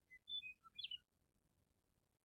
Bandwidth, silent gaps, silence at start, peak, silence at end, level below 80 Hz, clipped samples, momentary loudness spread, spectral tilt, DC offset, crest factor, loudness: 15.5 kHz; none; 0.1 s; -38 dBFS; 1.25 s; -88 dBFS; under 0.1%; 5 LU; -0.5 dB/octave; under 0.1%; 20 dB; -51 LUFS